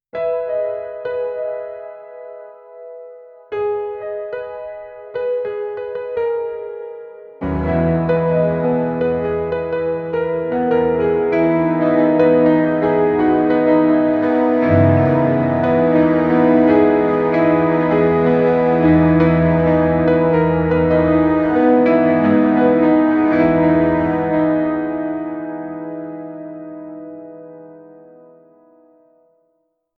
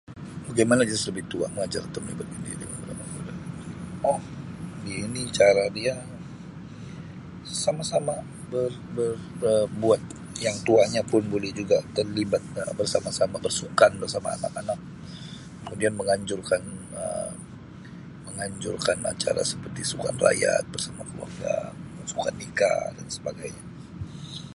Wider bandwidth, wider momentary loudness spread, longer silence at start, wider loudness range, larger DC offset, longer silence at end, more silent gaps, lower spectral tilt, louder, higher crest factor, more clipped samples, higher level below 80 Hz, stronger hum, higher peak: second, 4.8 kHz vs 11.5 kHz; about the same, 18 LU vs 19 LU; about the same, 0.15 s vs 0.1 s; first, 13 LU vs 6 LU; neither; first, 2.15 s vs 0 s; neither; first, -10.5 dB/octave vs -4 dB/octave; first, -16 LUFS vs -26 LUFS; second, 16 dB vs 24 dB; neither; first, -42 dBFS vs -54 dBFS; neither; about the same, -2 dBFS vs -4 dBFS